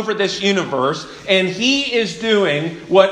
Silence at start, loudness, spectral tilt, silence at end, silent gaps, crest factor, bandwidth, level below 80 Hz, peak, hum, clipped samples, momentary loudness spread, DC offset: 0 s; -17 LUFS; -4 dB/octave; 0 s; none; 16 dB; 10.5 kHz; -56 dBFS; 0 dBFS; none; under 0.1%; 5 LU; under 0.1%